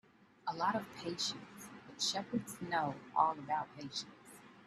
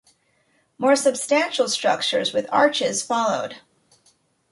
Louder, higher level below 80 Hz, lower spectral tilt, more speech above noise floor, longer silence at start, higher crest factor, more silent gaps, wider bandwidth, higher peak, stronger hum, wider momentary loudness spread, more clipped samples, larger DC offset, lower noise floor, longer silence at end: second, -38 LUFS vs -21 LUFS; second, -78 dBFS vs -72 dBFS; about the same, -3 dB/octave vs -2 dB/octave; second, 20 dB vs 44 dB; second, 0.45 s vs 0.8 s; first, 24 dB vs 18 dB; neither; first, 13.5 kHz vs 11.5 kHz; second, -16 dBFS vs -6 dBFS; neither; first, 18 LU vs 5 LU; neither; neither; second, -58 dBFS vs -65 dBFS; second, 0 s vs 0.95 s